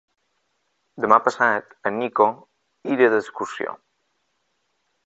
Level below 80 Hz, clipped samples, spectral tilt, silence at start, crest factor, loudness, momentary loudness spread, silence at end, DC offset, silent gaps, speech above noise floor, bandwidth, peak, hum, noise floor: -70 dBFS; under 0.1%; -5.5 dB/octave; 0.95 s; 24 dB; -21 LUFS; 14 LU; 1.3 s; under 0.1%; none; 52 dB; 8.2 kHz; 0 dBFS; none; -72 dBFS